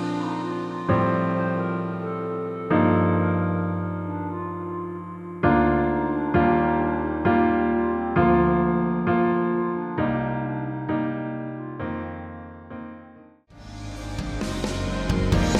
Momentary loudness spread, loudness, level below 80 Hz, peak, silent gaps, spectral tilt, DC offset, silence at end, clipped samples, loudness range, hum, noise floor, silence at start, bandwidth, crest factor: 15 LU; -24 LUFS; -38 dBFS; -6 dBFS; none; -7.5 dB/octave; under 0.1%; 0 s; under 0.1%; 11 LU; none; -49 dBFS; 0 s; 11.5 kHz; 18 dB